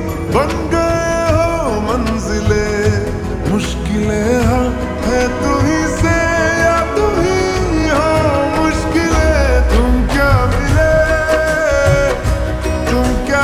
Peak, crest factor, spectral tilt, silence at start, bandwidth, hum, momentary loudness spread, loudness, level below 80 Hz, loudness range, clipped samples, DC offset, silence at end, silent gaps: 0 dBFS; 12 dB; -6 dB/octave; 0 s; 14 kHz; none; 5 LU; -14 LUFS; -20 dBFS; 3 LU; under 0.1%; under 0.1%; 0 s; none